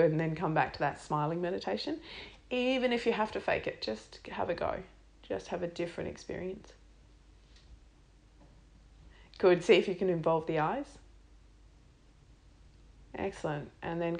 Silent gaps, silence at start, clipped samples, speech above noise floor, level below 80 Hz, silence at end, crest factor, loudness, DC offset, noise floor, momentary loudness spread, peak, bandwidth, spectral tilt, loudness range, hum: none; 0 s; under 0.1%; 28 dB; -58 dBFS; 0 s; 22 dB; -33 LUFS; under 0.1%; -60 dBFS; 15 LU; -12 dBFS; 10 kHz; -6 dB/octave; 12 LU; none